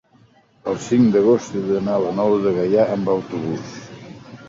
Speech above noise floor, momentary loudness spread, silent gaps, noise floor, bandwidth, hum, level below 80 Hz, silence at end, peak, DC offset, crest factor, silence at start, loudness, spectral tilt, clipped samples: 36 dB; 20 LU; none; -54 dBFS; 7.8 kHz; none; -56 dBFS; 0 s; -4 dBFS; under 0.1%; 16 dB; 0.65 s; -19 LUFS; -7 dB/octave; under 0.1%